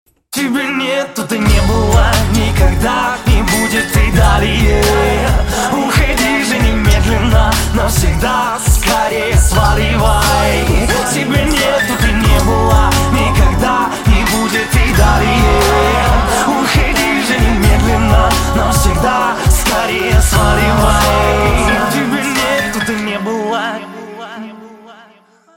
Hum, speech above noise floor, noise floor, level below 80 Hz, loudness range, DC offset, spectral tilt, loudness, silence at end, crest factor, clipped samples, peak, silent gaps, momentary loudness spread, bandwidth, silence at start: none; 36 dB; -47 dBFS; -16 dBFS; 2 LU; under 0.1%; -4.5 dB/octave; -12 LUFS; 0.65 s; 12 dB; under 0.1%; 0 dBFS; none; 5 LU; 17 kHz; 0.3 s